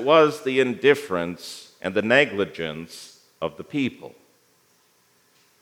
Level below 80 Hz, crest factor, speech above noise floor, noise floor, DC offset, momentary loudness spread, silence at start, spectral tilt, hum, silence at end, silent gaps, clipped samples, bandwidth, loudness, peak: -70 dBFS; 22 dB; 40 dB; -62 dBFS; under 0.1%; 18 LU; 0 s; -5 dB/octave; none; 1.5 s; none; under 0.1%; 16 kHz; -22 LUFS; -2 dBFS